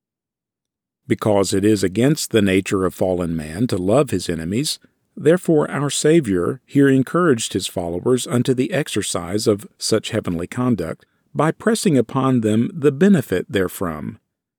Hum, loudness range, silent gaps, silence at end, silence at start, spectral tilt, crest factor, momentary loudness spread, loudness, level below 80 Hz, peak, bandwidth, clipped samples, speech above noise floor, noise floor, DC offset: none; 3 LU; none; 0.45 s; 1.1 s; -5.5 dB/octave; 16 dB; 8 LU; -19 LUFS; -52 dBFS; -4 dBFS; over 20 kHz; under 0.1%; 69 dB; -87 dBFS; under 0.1%